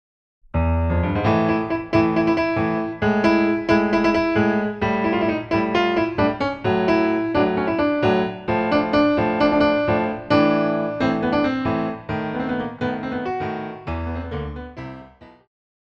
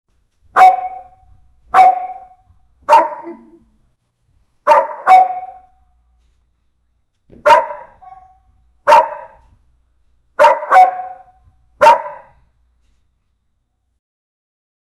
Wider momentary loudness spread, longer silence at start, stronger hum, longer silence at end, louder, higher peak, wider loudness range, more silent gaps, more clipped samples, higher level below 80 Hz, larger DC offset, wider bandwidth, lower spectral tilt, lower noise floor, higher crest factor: second, 10 LU vs 22 LU; about the same, 0.55 s vs 0.55 s; neither; second, 0.7 s vs 2.85 s; second, -21 LUFS vs -12 LUFS; second, -4 dBFS vs 0 dBFS; about the same, 7 LU vs 5 LU; neither; neither; first, -38 dBFS vs -56 dBFS; neither; second, 7 kHz vs 12.5 kHz; first, -8 dB/octave vs -2.5 dB/octave; second, -44 dBFS vs -66 dBFS; about the same, 16 dB vs 16 dB